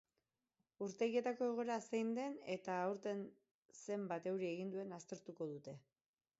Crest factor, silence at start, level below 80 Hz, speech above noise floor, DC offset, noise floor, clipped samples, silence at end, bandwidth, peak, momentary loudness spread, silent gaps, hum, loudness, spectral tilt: 18 dB; 0.8 s; under -90 dBFS; over 47 dB; under 0.1%; under -90 dBFS; under 0.1%; 0.6 s; 7.6 kHz; -26 dBFS; 14 LU; 3.51-3.69 s; none; -44 LUFS; -5.5 dB/octave